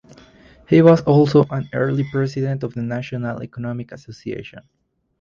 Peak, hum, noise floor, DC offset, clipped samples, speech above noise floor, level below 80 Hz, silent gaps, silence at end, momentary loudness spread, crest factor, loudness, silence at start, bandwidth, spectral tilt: 0 dBFS; none; -48 dBFS; under 0.1%; under 0.1%; 30 dB; -52 dBFS; none; 0.6 s; 19 LU; 18 dB; -18 LUFS; 0.7 s; 7.2 kHz; -8.5 dB/octave